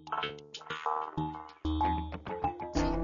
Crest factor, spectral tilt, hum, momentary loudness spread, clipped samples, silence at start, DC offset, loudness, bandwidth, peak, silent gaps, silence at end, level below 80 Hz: 18 dB; -4.5 dB/octave; none; 8 LU; under 0.1%; 0 s; under 0.1%; -35 LUFS; 7.2 kHz; -18 dBFS; none; 0 s; -42 dBFS